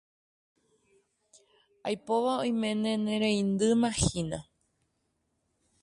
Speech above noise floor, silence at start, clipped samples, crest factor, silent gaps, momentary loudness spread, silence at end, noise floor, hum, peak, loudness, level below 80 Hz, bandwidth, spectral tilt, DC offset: 49 dB; 1.85 s; under 0.1%; 18 dB; none; 10 LU; 1.4 s; -77 dBFS; none; -12 dBFS; -29 LUFS; -52 dBFS; 11.5 kHz; -5 dB/octave; under 0.1%